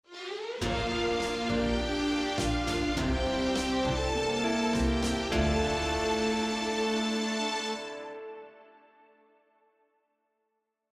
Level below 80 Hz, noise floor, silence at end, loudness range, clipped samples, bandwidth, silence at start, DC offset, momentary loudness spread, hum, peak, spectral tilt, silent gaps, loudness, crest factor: -40 dBFS; -81 dBFS; 2.3 s; 8 LU; under 0.1%; 14.5 kHz; 0.1 s; under 0.1%; 9 LU; none; -14 dBFS; -4.5 dB/octave; none; -30 LUFS; 16 dB